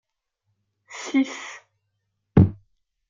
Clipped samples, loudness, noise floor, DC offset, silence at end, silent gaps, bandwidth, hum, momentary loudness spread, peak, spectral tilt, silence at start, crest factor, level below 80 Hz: under 0.1%; -22 LUFS; -76 dBFS; under 0.1%; 0.55 s; none; 7.6 kHz; none; 21 LU; -2 dBFS; -7 dB/octave; 0.95 s; 24 dB; -46 dBFS